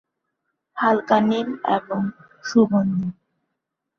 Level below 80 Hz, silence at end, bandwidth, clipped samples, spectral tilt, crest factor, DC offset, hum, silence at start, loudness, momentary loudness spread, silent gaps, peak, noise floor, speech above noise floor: -64 dBFS; 0.85 s; 7 kHz; under 0.1%; -7 dB/octave; 18 dB; under 0.1%; none; 0.75 s; -21 LUFS; 12 LU; none; -4 dBFS; -80 dBFS; 60 dB